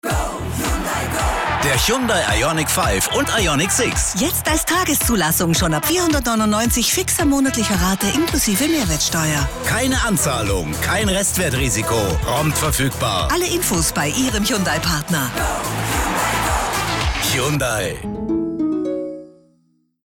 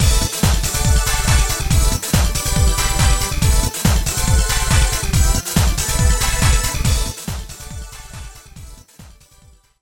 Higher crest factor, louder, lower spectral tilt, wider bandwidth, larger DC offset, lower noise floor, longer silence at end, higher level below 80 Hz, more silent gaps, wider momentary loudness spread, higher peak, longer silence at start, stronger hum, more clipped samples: about the same, 12 dB vs 16 dB; about the same, -18 LUFS vs -17 LUFS; about the same, -3.5 dB/octave vs -3.5 dB/octave; about the same, 18.5 kHz vs 17.5 kHz; neither; first, -61 dBFS vs -49 dBFS; about the same, 0.75 s vs 0.75 s; second, -30 dBFS vs -20 dBFS; neither; second, 5 LU vs 15 LU; second, -6 dBFS vs 0 dBFS; about the same, 0.05 s vs 0 s; neither; neither